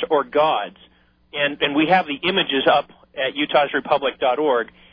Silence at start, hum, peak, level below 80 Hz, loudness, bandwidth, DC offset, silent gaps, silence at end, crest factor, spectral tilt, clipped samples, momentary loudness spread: 0 s; none; -4 dBFS; -60 dBFS; -20 LUFS; 5.2 kHz; under 0.1%; none; 0.25 s; 16 dB; -7 dB/octave; under 0.1%; 8 LU